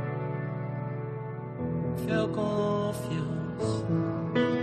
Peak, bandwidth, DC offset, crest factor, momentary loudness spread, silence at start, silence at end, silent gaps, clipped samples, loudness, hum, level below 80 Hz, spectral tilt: -14 dBFS; 13 kHz; under 0.1%; 16 dB; 7 LU; 0 s; 0 s; none; under 0.1%; -31 LUFS; none; -56 dBFS; -7.5 dB/octave